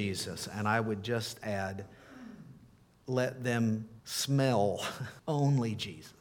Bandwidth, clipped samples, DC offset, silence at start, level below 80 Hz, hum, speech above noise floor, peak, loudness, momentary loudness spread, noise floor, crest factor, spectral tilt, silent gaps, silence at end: 18.5 kHz; under 0.1%; under 0.1%; 0 s; -68 dBFS; none; 28 dB; -14 dBFS; -33 LUFS; 21 LU; -60 dBFS; 18 dB; -5.5 dB/octave; none; 0.1 s